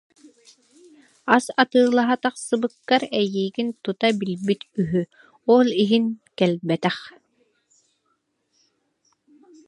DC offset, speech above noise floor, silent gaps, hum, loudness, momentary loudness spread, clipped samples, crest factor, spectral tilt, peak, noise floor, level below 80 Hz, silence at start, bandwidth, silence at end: under 0.1%; 50 dB; none; none; -22 LUFS; 9 LU; under 0.1%; 24 dB; -5.5 dB/octave; 0 dBFS; -71 dBFS; -66 dBFS; 1.25 s; 11.5 kHz; 2.6 s